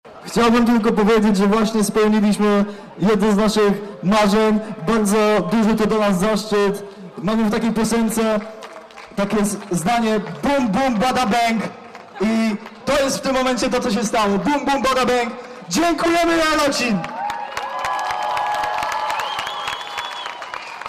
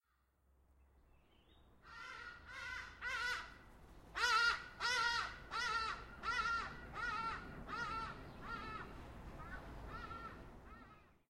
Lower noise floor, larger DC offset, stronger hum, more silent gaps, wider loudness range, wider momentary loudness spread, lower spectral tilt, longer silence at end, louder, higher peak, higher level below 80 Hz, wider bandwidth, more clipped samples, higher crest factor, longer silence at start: second, -38 dBFS vs -78 dBFS; neither; neither; neither; second, 4 LU vs 10 LU; second, 10 LU vs 19 LU; first, -5 dB/octave vs -2 dB/octave; second, 0 s vs 0.2 s; first, -19 LUFS vs -42 LUFS; first, -10 dBFS vs -22 dBFS; first, -44 dBFS vs -60 dBFS; about the same, 15.5 kHz vs 16 kHz; neither; second, 10 dB vs 22 dB; second, 0.05 s vs 0.8 s